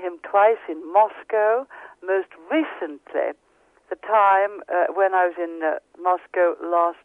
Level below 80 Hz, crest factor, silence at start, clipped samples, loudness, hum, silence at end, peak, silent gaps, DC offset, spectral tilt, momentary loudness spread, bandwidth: -76 dBFS; 16 dB; 0 s; under 0.1%; -22 LUFS; none; 0.1 s; -6 dBFS; none; under 0.1%; -5 dB/octave; 11 LU; 3.8 kHz